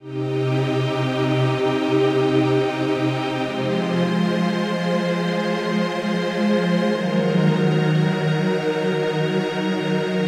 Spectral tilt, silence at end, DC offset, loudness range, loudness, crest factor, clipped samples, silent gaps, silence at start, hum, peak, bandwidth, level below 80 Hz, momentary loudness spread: -7 dB/octave; 0 s; under 0.1%; 2 LU; -21 LUFS; 12 dB; under 0.1%; none; 0 s; none; -8 dBFS; 12.5 kHz; -62 dBFS; 4 LU